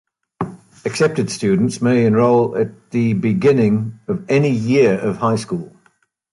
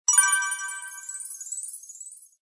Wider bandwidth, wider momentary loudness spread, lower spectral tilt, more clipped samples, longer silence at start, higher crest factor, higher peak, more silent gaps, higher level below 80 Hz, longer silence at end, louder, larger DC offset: about the same, 11.5 kHz vs 11 kHz; second, 13 LU vs 22 LU; first, -7 dB/octave vs 10 dB/octave; neither; first, 0.4 s vs 0.1 s; second, 14 dB vs 22 dB; first, -2 dBFS vs -6 dBFS; neither; first, -54 dBFS vs under -90 dBFS; first, 0.65 s vs 0.15 s; first, -17 LUFS vs -25 LUFS; neither